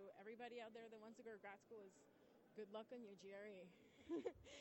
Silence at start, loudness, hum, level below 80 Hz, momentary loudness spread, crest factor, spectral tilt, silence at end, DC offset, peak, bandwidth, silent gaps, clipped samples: 0 s; -58 LUFS; none; -84 dBFS; 12 LU; 20 dB; -5 dB/octave; 0 s; under 0.1%; -36 dBFS; 16.5 kHz; none; under 0.1%